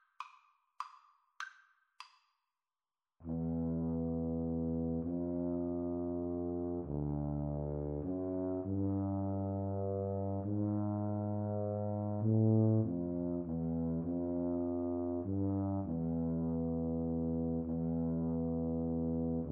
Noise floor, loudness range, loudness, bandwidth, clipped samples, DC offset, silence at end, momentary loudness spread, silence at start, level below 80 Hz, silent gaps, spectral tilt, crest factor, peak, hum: under -90 dBFS; 6 LU; -37 LUFS; 6.6 kHz; under 0.1%; under 0.1%; 0 s; 4 LU; 0.2 s; -54 dBFS; none; -10.5 dB/octave; 16 dB; -22 dBFS; none